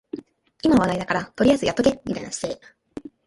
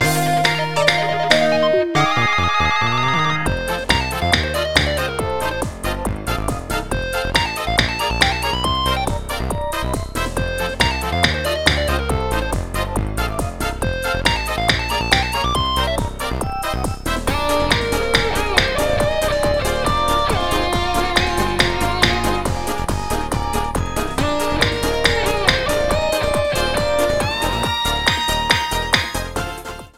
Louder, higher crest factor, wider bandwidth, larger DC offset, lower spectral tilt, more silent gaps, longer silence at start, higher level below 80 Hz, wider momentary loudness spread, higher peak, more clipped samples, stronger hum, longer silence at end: second, -22 LUFS vs -18 LUFS; about the same, 18 dB vs 18 dB; second, 11.5 kHz vs 17 kHz; second, under 0.1% vs 1%; about the same, -5 dB/octave vs -4 dB/octave; neither; first, 0.15 s vs 0 s; second, -48 dBFS vs -28 dBFS; first, 19 LU vs 7 LU; second, -4 dBFS vs 0 dBFS; neither; neither; first, 0.2 s vs 0 s